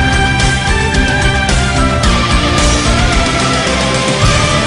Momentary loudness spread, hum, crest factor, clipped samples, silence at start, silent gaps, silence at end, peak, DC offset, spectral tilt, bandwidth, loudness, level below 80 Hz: 1 LU; none; 10 dB; under 0.1%; 0 s; none; 0 s; 0 dBFS; under 0.1%; -4 dB/octave; 11 kHz; -11 LUFS; -16 dBFS